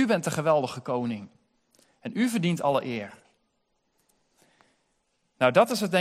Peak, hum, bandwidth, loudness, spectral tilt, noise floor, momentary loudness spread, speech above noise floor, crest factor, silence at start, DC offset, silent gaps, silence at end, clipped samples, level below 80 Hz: -6 dBFS; none; 15.5 kHz; -26 LUFS; -5.5 dB/octave; -74 dBFS; 14 LU; 49 dB; 22 dB; 0 s; under 0.1%; none; 0 s; under 0.1%; -72 dBFS